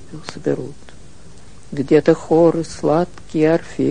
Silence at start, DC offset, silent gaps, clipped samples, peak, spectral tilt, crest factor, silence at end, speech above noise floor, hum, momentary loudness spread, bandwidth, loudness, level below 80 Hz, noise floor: 0.15 s; 2%; none; under 0.1%; 0 dBFS; -7 dB/octave; 18 dB; 0 s; 26 dB; none; 13 LU; 10 kHz; -17 LUFS; -48 dBFS; -43 dBFS